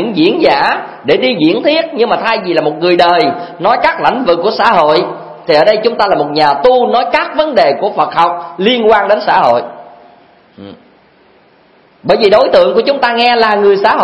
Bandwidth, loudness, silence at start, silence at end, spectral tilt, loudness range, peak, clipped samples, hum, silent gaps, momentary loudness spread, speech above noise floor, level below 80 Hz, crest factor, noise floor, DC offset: 11 kHz; -10 LUFS; 0 s; 0 s; -6 dB/octave; 4 LU; 0 dBFS; 0.3%; none; none; 5 LU; 36 dB; -50 dBFS; 10 dB; -46 dBFS; under 0.1%